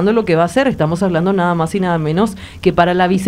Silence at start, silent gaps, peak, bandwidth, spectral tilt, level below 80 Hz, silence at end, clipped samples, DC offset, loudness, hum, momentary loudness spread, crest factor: 0 s; none; 0 dBFS; 14 kHz; -7 dB/octave; -40 dBFS; 0 s; under 0.1%; under 0.1%; -15 LUFS; none; 4 LU; 14 dB